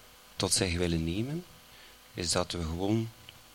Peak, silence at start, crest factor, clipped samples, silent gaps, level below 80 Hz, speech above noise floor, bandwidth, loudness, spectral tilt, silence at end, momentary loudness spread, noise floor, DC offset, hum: -12 dBFS; 0 s; 20 dB; under 0.1%; none; -48 dBFS; 23 dB; 17 kHz; -31 LUFS; -4 dB/octave; 0.15 s; 24 LU; -54 dBFS; under 0.1%; none